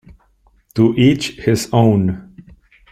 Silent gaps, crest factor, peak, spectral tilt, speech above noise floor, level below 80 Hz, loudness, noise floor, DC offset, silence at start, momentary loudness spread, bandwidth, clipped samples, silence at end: none; 16 dB; -2 dBFS; -6.5 dB/octave; 42 dB; -46 dBFS; -15 LUFS; -55 dBFS; under 0.1%; 0.75 s; 11 LU; 15.5 kHz; under 0.1%; 0.7 s